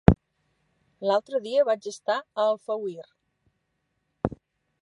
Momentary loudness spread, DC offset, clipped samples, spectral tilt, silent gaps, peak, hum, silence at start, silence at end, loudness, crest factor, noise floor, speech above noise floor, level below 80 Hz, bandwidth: 9 LU; under 0.1%; under 0.1%; -7 dB/octave; none; 0 dBFS; none; 0.1 s; 0.5 s; -27 LUFS; 26 dB; -76 dBFS; 50 dB; -40 dBFS; 11 kHz